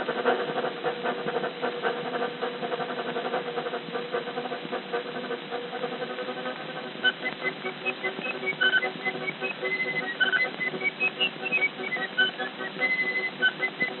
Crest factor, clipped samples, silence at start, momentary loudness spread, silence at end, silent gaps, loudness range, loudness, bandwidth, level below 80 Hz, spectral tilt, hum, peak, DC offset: 18 dB; under 0.1%; 0 s; 8 LU; 0 s; none; 6 LU; -28 LUFS; 4.3 kHz; under -90 dBFS; -0.5 dB/octave; none; -10 dBFS; under 0.1%